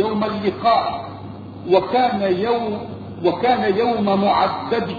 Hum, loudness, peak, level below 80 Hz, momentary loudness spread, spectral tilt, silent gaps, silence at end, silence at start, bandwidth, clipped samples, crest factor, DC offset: none; -19 LUFS; -2 dBFS; -52 dBFS; 14 LU; -8 dB/octave; none; 0 s; 0 s; 6.8 kHz; under 0.1%; 16 dB; under 0.1%